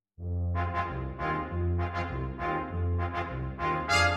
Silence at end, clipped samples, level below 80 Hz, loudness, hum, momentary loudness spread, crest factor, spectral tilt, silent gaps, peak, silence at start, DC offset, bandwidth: 0 s; under 0.1%; -42 dBFS; -32 LUFS; none; 4 LU; 18 dB; -5.5 dB/octave; none; -12 dBFS; 0.2 s; under 0.1%; 12 kHz